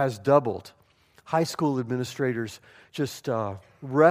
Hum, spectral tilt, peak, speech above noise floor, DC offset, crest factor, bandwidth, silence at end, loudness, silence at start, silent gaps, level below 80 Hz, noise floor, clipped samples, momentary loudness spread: none; -6 dB/octave; -4 dBFS; 35 dB; under 0.1%; 22 dB; 15.5 kHz; 0 s; -27 LUFS; 0 s; none; -68 dBFS; -60 dBFS; under 0.1%; 16 LU